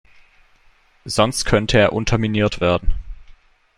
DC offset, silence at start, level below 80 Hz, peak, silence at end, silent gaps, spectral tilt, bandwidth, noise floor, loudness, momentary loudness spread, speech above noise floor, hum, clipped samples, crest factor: under 0.1%; 1.05 s; -30 dBFS; 0 dBFS; 0.55 s; none; -5 dB/octave; 13.5 kHz; -54 dBFS; -18 LUFS; 13 LU; 37 dB; none; under 0.1%; 20 dB